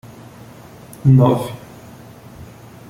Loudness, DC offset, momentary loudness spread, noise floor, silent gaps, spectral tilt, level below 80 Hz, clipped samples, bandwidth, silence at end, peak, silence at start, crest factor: -15 LUFS; under 0.1%; 27 LU; -40 dBFS; none; -9 dB/octave; -48 dBFS; under 0.1%; 15.5 kHz; 0.45 s; -2 dBFS; 1.05 s; 18 dB